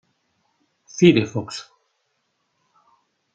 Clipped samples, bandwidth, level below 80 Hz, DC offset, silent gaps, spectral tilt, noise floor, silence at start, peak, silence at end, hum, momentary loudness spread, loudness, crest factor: under 0.1%; 9 kHz; -64 dBFS; under 0.1%; none; -6 dB/octave; -72 dBFS; 0.95 s; -2 dBFS; 1.7 s; none; 20 LU; -19 LUFS; 22 dB